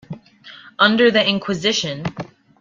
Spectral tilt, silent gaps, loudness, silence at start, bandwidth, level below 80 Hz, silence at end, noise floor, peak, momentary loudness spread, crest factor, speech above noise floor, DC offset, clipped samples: -4 dB/octave; none; -17 LUFS; 0.1 s; 7.6 kHz; -58 dBFS; 0.35 s; -43 dBFS; 0 dBFS; 23 LU; 20 dB; 26 dB; under 0.1%; under 0.1%